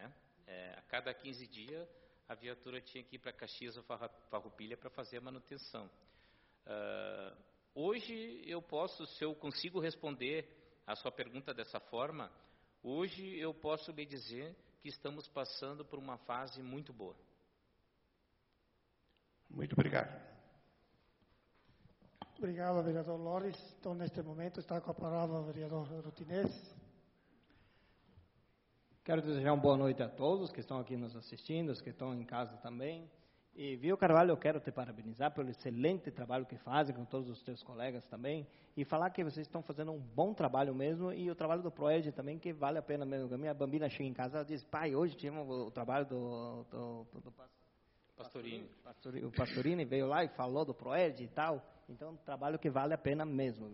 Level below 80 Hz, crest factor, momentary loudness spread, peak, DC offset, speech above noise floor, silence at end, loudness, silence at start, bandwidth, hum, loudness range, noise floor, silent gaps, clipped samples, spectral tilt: -74 dBFS; 24 dB; 16 LU; -16 dBFS; under 0.1%; 38 dB; 0 s; -40 LUFS; 0 s; 5.8 kHz; none; 13 LU; -78 dBFS; none; under 0.1%; -5.5 dB/octave